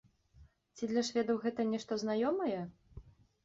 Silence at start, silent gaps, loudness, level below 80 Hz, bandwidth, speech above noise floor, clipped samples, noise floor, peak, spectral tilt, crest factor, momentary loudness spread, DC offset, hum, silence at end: 0.4 s; none; -35 LUFS; -64 dBFS; 7.6 kHz; 29 dB; under 0.1%; -63 dBFS; -20 dBFS; -4.5 dB/octave; 16 dB; 9 LU; under 0.1%; none; 0.35 s